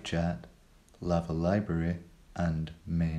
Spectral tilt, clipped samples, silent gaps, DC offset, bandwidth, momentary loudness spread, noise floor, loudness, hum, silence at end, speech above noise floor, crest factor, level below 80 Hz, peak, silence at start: -7.5 dB/octave; under 0.1%; none; under 0.1%; 9.4 kHz; 11 LU; -58 dBFS; -33 LUFS; none; 0 s; 28 dB; 18 dB; -50 dBFS; -14 dBFS; 0 s